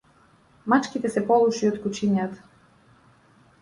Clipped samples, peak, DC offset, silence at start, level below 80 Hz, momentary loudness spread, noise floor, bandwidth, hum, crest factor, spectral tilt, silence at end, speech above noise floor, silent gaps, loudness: under 0.1%; -6 dBFS; under 0.1%; 0.65 s; -64 dBFS; 13 LU; -58 dBFS; 11.5 kHz; none; 18 dB; -6 dB/octave; 1.25 s; 36 dB; none; -23 LUFS